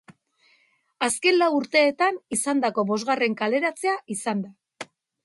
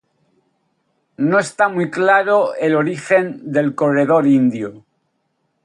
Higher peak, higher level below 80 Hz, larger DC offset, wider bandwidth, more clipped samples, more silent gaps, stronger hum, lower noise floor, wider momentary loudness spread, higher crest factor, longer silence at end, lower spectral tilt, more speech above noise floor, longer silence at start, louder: second, -6 dBFS vs -2 dBFS; second, -72 dBFS vs -66 dBFS; neither; about the same, 12 kHz vs 11.5 kHz; neither; neither; neither; second, -64 dBFS vs -68 dBFS; first, 19 LU vs 6 LU; about the same, 18 dB vs 16 dB; second, 0.4 s vs 0.85 s; second, -3 dB/octave vs -6.5 dB/octave; second, 41 dB vs 53 dB; second, 0.1 s vs 1.2 s; second, -23 LUFS vs -16 LUFS